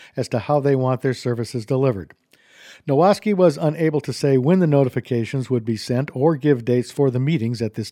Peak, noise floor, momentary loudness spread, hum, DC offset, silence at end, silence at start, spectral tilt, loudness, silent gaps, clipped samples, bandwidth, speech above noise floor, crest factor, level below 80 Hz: -4 dBFS; -48 dBFS; 8 LU; none; under 0.1%; 0 s; 0 s; -7.5 dB/octave; -20 LUFS; none; under 0.1%; 14.5 kHz; 29 dB; 16 dB; -62 dBFS